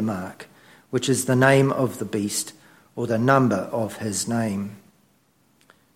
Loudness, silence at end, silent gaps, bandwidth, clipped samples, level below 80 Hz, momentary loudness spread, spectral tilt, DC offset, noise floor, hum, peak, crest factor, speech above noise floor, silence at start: -22 LUFS; 1.15 s; none; 16.5 kHz; under 0.1%; -62 dBFS; 17 LU; -5 dB/octave; under 0.1%; -63 dBFS; none; -4 dBFS; 20 dB; 40 dB; 0 s